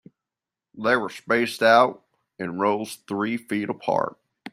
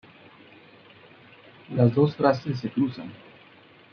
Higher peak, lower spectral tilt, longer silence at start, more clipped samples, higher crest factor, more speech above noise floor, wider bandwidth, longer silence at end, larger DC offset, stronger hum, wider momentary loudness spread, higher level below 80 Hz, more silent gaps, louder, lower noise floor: about the same, -2 dBFS vs -4 dBFS; second, -5 dB/octave vs -9 dB/octave; second, 0.75 s vs 1.7 s; neither; about the same, 22 dB vs 22 dB; first, 66 dB vs 30 dB; first, 16 kHz vs 6.6 kHz; second, 0.05 s vs 0.75 s; neither; neither; about the same, 13 LU vs 15 LU; about the same, -68 dBFS vs -68 dBFS; neither; about the same, -23 LUFS vs -24 LUFS; first, -89 dBFS vs -53 dBFS